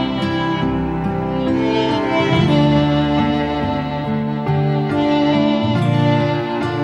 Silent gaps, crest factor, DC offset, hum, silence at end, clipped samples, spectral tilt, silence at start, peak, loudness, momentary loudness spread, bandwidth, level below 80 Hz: none; 14 dB; under 0.1%; none; 0 s; under 0.1%; -7.5 dB/octave; 0 s; -4 dBFS; -17 LUFS; 6 LU; 8.6 kHz; -38 dBFS